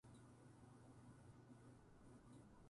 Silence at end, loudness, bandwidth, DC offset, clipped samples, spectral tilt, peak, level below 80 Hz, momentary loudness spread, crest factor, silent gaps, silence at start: 0 s; -66 LUFS; 11 kHz; under 0.1%; under 0.1%; -6.5 dB/octave; -54 dBFS; -78 dBFS; 2 LU; 12 dB; none; 0.05 s